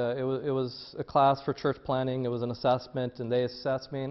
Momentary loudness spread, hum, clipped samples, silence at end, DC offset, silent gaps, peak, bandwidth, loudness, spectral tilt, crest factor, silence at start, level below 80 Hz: 8 LU; none; under 0.1%; 0 s; under 0.1%; none; -12 dBFS; 6 kHz; -30 LUFS; -8 dB/octave; 18 dB; 0 s; -62 dBFS